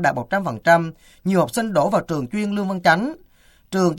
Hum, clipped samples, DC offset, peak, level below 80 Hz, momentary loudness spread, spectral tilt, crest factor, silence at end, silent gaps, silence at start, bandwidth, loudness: none; under 0.1%; under 0.1%; 0 dBFS; -54 dBFS; 10 LU; -6 dB/octave; 20 dB; 0 s; none; 0 s; 17 kHz; -20 LUFS